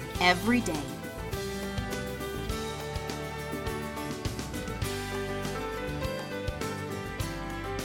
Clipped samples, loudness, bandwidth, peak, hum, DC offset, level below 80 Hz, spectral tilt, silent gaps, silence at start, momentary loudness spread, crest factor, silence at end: under 0.1%; -33 LUFS; 17.5 kHz; -10 dBFS; none; under 0.1%; -44 dBFS; -4.5 dB/octave; none; 0 s; 9 LU; 24 dB; 0 s